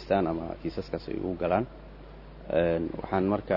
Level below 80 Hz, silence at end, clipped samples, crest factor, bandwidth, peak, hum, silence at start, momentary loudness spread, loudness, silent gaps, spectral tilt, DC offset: -48 dBFS; 0 s; under 0.1%; 20 dB; 6 kHz; -10 dBFS; none; 0 s; 21 LU; -30 LUFS; none; -9 dB/octave; under 0.1%